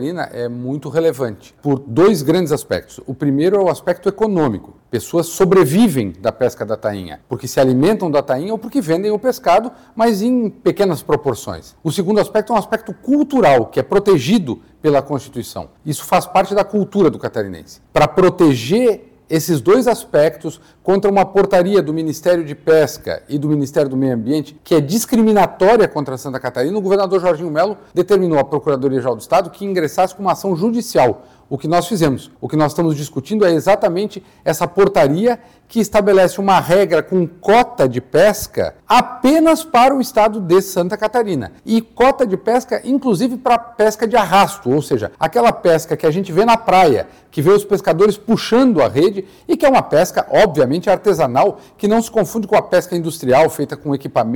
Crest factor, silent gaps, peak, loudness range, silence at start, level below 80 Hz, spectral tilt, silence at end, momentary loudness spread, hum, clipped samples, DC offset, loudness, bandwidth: 10 dB; none; -6 dBFS; 3 LU; 0 s; -48 dBFS; -6 dB/octave; 0 s; 11 LU; none; under 0.1%; 0.3%; -15 LUFS; 19.5 kHz